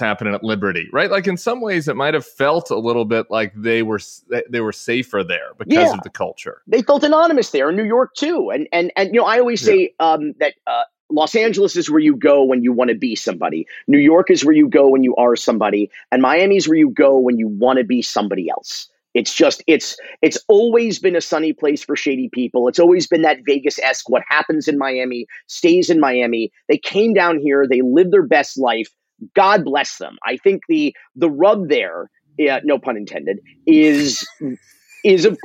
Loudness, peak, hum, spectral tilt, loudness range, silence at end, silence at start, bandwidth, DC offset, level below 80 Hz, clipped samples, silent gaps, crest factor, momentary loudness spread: -16 LUFS; 0 dBFS; none; -4.5 dB/octave; 5 LU; 0.1 s; 0 s; 9.2 kHz; under 0.1%; -66 dBFS; under 0.1%; 11.00-11.09 s; 16 dB; 11 LU